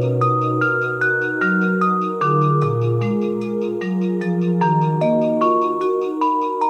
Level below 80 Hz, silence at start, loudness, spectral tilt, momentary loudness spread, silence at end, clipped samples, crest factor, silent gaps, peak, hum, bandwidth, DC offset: -64 dBFS; 0 s; -19 LUFS; -8.5 dB/octave; 4 LU; 0 s; under 0.1%; 12 dB; none; -6 dBFS; none; 8.4 kHz; under 0.1%